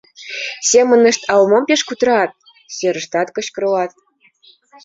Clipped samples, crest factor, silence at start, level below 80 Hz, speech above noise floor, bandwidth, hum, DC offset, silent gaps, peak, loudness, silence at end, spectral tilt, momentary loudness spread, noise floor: under 0.1%; 14 dB; 0.2 s; -62 dBFS; 37 dB; 7.8 kHz; none; under 0.1%; none; -2 dBFS; -15 LUFS; 0.95 s; -2.5 dB/octave; 13 LU; -51 dBFS